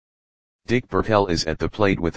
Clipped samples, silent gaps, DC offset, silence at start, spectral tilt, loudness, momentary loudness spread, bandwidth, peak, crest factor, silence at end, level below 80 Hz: under 0.1%; none; under 0.1%; 0.6 s; -5.5 dB/octave; -22 LUFS; 5 LU; 9.8 kHz; 0 dBFS; 22 dB; 0 s; -40 dBFS